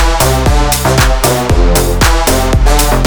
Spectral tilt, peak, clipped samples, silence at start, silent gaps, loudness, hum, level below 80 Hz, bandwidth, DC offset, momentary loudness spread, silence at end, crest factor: -4 dB/octave; 0 dBFS; under 0.1%; 0 s; none; -10 LUFS; none; -12 dBFS; over 20 kHz; under 0.1%; 2 LU; 0 s; 8 dB